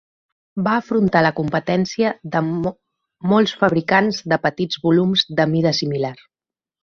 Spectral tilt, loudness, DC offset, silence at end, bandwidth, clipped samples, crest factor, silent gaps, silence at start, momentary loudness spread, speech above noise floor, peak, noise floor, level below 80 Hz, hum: -6 dB/octave; -19 LUFS; under 0.1%; 0.7 s; 7.2 kHz; under 0.1%; 18 dB; none; 0.55 s; 8 LU; over 72 dB; -2 dBFS; under -90 dBFS; -56 dBFS; none